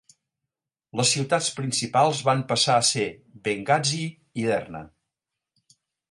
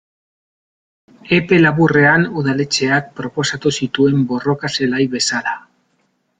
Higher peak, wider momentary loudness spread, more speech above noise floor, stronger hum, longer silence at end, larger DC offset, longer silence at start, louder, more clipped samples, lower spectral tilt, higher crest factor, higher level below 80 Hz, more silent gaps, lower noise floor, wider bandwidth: second, -6 dBFS vs -2 dBFS; first, 12 LU vs 9 LU; first, 62 dB vs 49 dB; neither; first, 1.25 s vs 0.8 s; neither; second, 0.95 s vs 1.25 s; second, -23 LUFS vs -15 LUFS; neither; second, -3 dB/octave vs -5 dB/octave; about the same, 20 dB vs 16 dB; second, -64 dBFS vs -54 dBFS; neither; first, -86 dBFS vs -64 dBFS; first, 11.5 kHz vs 9.6 kHz